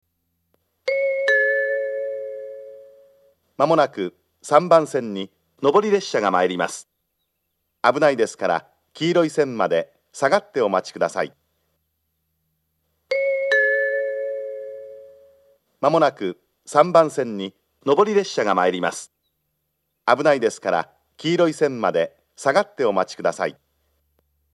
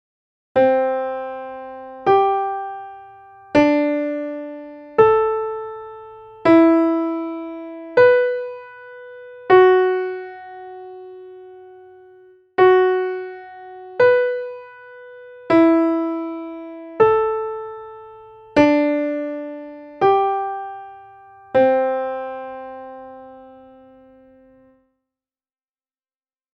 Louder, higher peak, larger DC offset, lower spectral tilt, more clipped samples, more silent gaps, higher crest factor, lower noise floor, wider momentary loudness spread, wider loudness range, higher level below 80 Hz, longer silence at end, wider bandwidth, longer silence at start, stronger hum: second, -21 LUFS vs -18 LUFS; about the same, 0 dBFS vs -2 dBFS; neither; second, -4.5 dB/octave vs -7 dB/octave; neither; neither; about the same, 22 dB vs 18 dB; second, -75 dBFS vs under -90 dBFS; second, 14 LU vs 24 LU; about the same, 4 LU vs 5 LU; second, -76 dBFS vs -58 dBFS; second, 1 s vs 3.15 s; first, 12.5 kHz vs 6.2 kHz; first, 0.85 s vs 0.55 s; neither